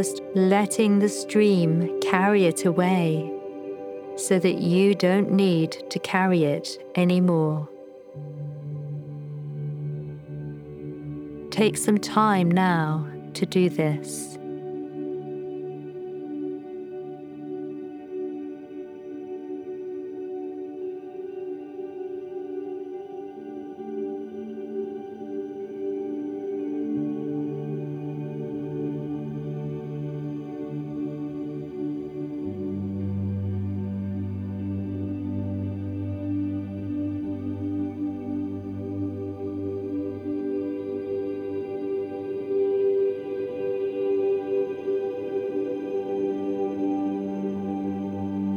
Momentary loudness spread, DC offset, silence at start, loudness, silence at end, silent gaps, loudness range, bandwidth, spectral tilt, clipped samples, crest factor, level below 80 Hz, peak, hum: 15 LU; under 0.1%; 0 s; -27 LUFS; 0 s; none; 12 LU; 16.5 kHz; -6.5 dB/octave; under 0.1%; 24 dB; -66 dBFS; -4 dBFS; none